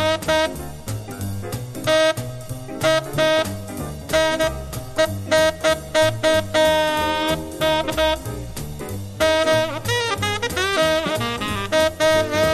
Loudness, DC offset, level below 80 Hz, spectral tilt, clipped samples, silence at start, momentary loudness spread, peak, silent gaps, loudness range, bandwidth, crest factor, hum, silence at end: -20 LUFS; under 0.1%; -40 dBFS; -4 dB/octave; under 0.1%; 0 s; 13 LU; -6 dBFS; none; 3 LU; 13.5 kHz; 14 dB; none; 0 s